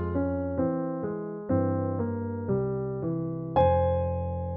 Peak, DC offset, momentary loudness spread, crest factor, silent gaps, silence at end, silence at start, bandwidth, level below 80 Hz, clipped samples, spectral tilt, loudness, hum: -12 dBFS; under 0.1%; 8 LU; 16 dB; none; 0 s; 0 s; 3.6 kHz; -46 dBFS; under 0.1%; -9 dB/octave; -29 LUFS; none